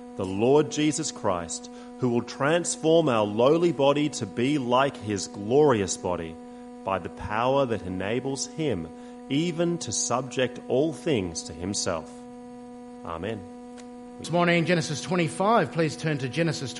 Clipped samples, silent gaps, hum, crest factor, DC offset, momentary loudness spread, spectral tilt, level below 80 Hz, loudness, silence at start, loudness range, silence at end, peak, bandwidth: under 0.1%; none; none; 18 dB; under 0.1%; 18 LU; -4.5 dB/octave; -58 dBFS; -26 LUFS; 0 s; 6 LU; 0 s; -8 dBFS; 11.5 kHz